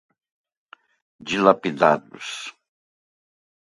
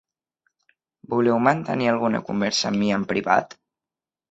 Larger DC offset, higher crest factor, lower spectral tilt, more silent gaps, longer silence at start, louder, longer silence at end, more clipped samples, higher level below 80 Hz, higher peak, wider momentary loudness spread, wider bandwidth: neither; about the same, 24 dB vs 20 dB; about the same, -5 dB/octave vs -5 dB/octave; neither; first, 1.25 s vs 1.1 s; about the same, -20 LUFS vs -22 LUFS; first, 1.2 s vs 0.8 s; neither; second, -68 dBFS vs -62 dBFS; first, 0 dBFS vs -4 dBFS; first, 17 LU vs 5 LU; first, 11.5 kHz vs 8.2 kHz